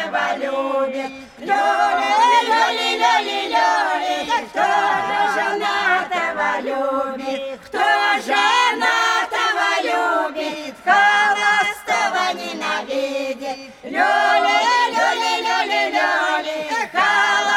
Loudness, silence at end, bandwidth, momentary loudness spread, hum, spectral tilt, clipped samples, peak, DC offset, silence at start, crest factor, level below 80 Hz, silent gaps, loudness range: -18 LUFS; 0 s; 17 kHz; 9 LU; none; -1 dB/octave; under 0.1%; -2 dBFS; under 0.1%; 0 s; 16 dB; -62 dBFS; none; 2 LU